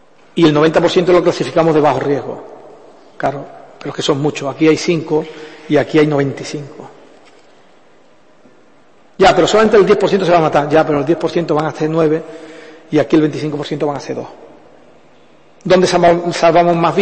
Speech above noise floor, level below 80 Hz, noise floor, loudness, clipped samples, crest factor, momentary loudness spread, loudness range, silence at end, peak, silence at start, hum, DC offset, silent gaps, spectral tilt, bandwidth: 36 dB; -48 dBFS; -49 dBFS; -13 LUFS; under 0.1%; 14 dB; 17 LU; 7 LU; 0 s; 0 dBFS; 0.35 s; none; 0.4%; none; -6 dB/octave; 8.8 kHz